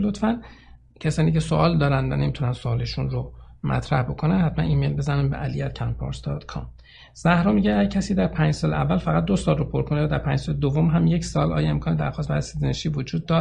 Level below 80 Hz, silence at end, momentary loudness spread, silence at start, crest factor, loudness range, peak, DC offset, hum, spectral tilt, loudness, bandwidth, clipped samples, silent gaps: -38 dBFS; 0 s; 9 LU; 0 s; 18 dB; 3 LU; -4 dBFS; under 0.1%; none; -7 dB/octave; -23 LUFS; 9.8 kHz; under 0.1%; none